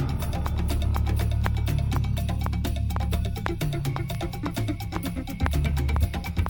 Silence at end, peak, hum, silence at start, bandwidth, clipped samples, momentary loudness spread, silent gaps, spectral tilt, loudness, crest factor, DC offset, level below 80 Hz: 0 s; -6 dBFS; none; 0 s; 20 kHz; under 0.1%; 5 LU; none; -6.5 dB/octave; -28 LUFS; 20 dB; under 0.1%; -28 dBFS